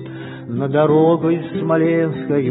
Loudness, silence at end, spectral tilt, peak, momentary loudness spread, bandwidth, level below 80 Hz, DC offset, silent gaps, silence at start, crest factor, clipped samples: -17 LUFS; 0 s; -13 dB/octave; -2 dBFS; 13 LU; 4 kHz; -60 dBFS; under 0.1%; none; 0 s; 14 dB; under 0.1%